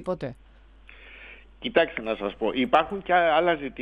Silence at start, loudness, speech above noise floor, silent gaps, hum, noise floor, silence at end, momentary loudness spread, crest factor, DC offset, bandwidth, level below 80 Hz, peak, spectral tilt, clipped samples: 0 s; -24 LUFS; 26 dB; none; none; -51 dBFS; 0 s; 19 LU; 22 dB; under 0.1%; 7.8 kHz; -52 dBFS; -4 dBFS; -6.5 dB/octave; under 0.1%